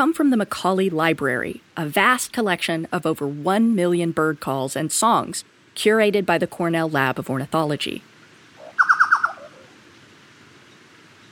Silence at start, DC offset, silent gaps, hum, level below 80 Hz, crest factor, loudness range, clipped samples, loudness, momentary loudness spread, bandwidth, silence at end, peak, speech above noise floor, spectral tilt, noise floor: 0 s; under 0.1%; none; none; -64 dBFS; 20 dB; 2 LU; under 0.1%; -21 LUFS; 9 LU; 20 kHz; 1.85 s; -2 dBFS; 28 dB; -4.5 dB/octave; -49 dBFS